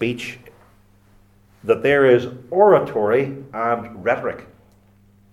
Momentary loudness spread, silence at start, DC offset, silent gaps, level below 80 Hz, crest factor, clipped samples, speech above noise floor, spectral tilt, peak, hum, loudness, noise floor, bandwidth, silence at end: 15 LU; 0 s; under 0.1%; none; -56 dBFS; 20 dB; under 0.1%; 35 dB; -7 dB/octave; -2 dBFS; none; -19 LUFS; -53 dBFS; 12.5 kHz; 0.9 s